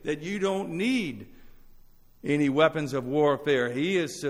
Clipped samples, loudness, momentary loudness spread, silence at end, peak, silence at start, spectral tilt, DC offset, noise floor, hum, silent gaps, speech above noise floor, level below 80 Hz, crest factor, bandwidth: under 0.1%; -26 LUFS; 8 LU; 0 s; -10 dBFS; 0.05 s; -5.5 dB/octave; under 0.1%; -53 dBFS; none; none; 27 dB; -56 dBFS; 18 dB; 15 kHz